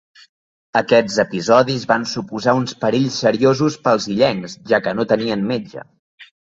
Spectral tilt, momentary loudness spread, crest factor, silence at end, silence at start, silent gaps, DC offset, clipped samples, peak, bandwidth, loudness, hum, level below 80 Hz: -5 dB/octave; 8 LU; 16 dB; 0.25 s; 0.75 s; 5.99-6.18 s; under 0.1%; under 0.1%; -2 dBFS; 8 kHz; -18 LUFS; none; -56 dBFS